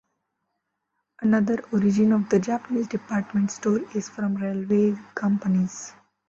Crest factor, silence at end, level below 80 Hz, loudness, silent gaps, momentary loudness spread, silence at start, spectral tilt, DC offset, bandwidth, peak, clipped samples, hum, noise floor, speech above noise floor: 14 dB; 0.4 s; -64 dBFS; -24 LUFS; none; 8 LU; 1.2 s; -7 dB/octave; under 0.1%; 7.6 kHz; -10 dBFS; under 0.1%; none; -79 dBFS; 55 dB